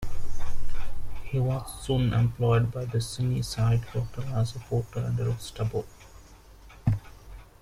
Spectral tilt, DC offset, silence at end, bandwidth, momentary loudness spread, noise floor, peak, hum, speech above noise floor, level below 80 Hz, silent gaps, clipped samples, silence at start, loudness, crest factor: -6.5 dB/octave; under 0.1%; 0.2 s; 13 kHz; 16 LU; -50 dBFS; -12 dBFS; none; 23 dB; -38 dBFS; none; under 0.1%; 0 s; -29 LUFS; 14 dB